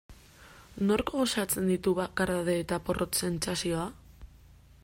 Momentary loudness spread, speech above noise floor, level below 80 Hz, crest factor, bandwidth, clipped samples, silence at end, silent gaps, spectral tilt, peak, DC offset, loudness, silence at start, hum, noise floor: 5 LU; 26 dB; -52 dBFS; 18 dB; 16 kHz; under 0.1%; 0.45 s; none; -4.5 dB/octave; -14 dBFS; under 0.1%; -30 LUFS; 0.1 s; none; -55 dBFS